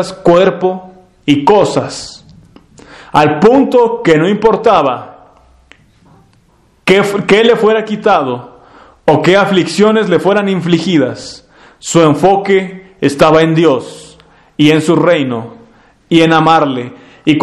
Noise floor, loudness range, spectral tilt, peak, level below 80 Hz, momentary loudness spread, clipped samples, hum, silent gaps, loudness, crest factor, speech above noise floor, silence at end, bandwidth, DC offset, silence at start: -50 dBFS; 2 LU; -5.5 dB/octave; 0 dBFS; -46 dBFS; 14 LU; 0.6%; none; none; -10 LUFS; 12 dB; 40 dB; 0 s; 12.5 kHz; under 0.1%; 0 s